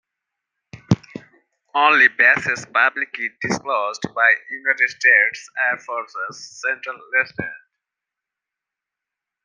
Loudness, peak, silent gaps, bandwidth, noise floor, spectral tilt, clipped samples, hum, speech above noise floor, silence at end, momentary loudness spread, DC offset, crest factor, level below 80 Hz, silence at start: -18 LUFS; -2 dBFS; none; 10 kHz; -86 dBFS; -4 dB/octave; under 0.1%; none; 66 dB; 1.9 s; 15 LU; under 0.1%; 20 dB; -60 dBFS; 0.75 s